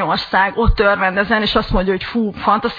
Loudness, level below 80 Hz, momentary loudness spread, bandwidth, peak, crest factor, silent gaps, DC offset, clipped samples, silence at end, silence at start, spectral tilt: -16 LUFS; -26 dBFS; 4 LU; 5.2 kHz; 0 dBFS; 16 dB; none; under 0.1%; under 0.1%; 0 s; 0 s; -7 dB/octave